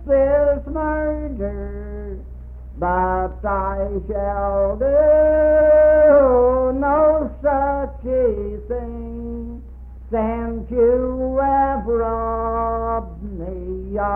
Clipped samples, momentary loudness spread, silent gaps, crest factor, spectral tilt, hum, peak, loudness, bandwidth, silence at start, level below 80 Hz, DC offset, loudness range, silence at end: under 0.1%; 18 LU; none; 14 dB; -11.5 dB/octave; none; -4 dBFS; -18 LUFS; 3 kHz; 0 s; -30 dBFS; under 0.1%; 9 LU; 0 s